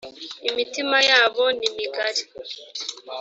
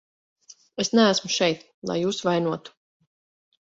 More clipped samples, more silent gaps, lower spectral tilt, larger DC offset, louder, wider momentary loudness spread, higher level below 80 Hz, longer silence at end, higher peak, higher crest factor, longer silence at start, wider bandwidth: neither; second, none vs 1.74-1.82 s; second, 0.5 dB/octave vs -4 dB/octave; neither; about the same, -21 LUFS vs -23 LUFS; first, 18 LU vs 13 LU; about the same, -70 dBFS vs -68 dBFS; second, 0 s vs 0.95 s; first, -2 dBFS vs -6 dBFS; about the same, 22 dB vs 20 dB; second, 0.05 s vs 0.75 s; about the same, 8 kHz vs 8 kHz